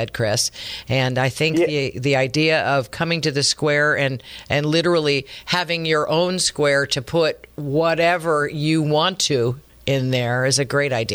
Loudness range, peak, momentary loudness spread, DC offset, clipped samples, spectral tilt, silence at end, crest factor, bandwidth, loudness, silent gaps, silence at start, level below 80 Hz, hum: 1 LU; -4 dBFS; 6 LU; under 0.1%; under 0.1%; -4 dB/octave; 0 s; 16 dB; over 20 kHz; -19 LUFS; none; 0 s; -52 dBFS; none